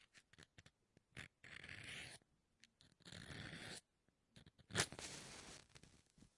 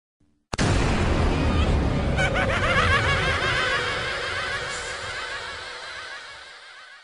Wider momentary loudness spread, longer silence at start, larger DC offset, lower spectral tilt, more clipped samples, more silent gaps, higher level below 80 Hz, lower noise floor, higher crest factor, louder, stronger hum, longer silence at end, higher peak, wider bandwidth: first, 24 LU vs 15 LU; second, 0 s vs 0.5 s; neither; second, -2 dB/octave vs -4.5 dB/octave; neither; neither; second, -76 dBFS vs -32 dBFS; first, -84 dBFS vs -45 dBFS; first, 36 dB vs 16 dB; second, -51 LUFS vs -24 LUFS; neither; about the same, 0.1 s vs 0.05 s; second, -18 dBFS vs -8 dBFS; first, 12 kHz vs 10.5 kHz